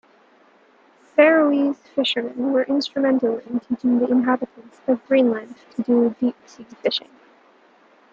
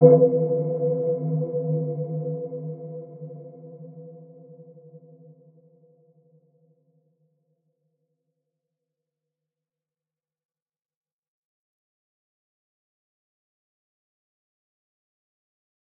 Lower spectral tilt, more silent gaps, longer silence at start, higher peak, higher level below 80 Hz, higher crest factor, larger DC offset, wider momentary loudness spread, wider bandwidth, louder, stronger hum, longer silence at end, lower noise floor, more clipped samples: second, -5.5 dB/octave vs -16 dB/octave; neither; first, 1.15 s vs 0 s; about the same, -2 dBFS vs -2 dBFS; first, -70 dBFS vs -88 dBFS; second, 20 dB vs 28 dB; neither; second, 10 LU vs 24 LU; first, 7.8 kHz vs 2.3 kHz; first, -20 LUFS vs -24 LUFS; neither; second, 1.15 s vs 11 s; second, -55 dBFS vs under -90 dBFS; neither